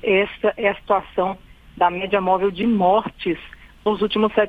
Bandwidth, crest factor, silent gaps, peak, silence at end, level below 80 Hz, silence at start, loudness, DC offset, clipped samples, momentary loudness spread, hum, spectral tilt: 4.9 kHz; 16 dB; none; -4 dBFS; 0 s; -48 dBFS; 0.05 s; -21 LUFS; under 0.1%; under 0.1%; 8 LU; none; -7.5 dB/octave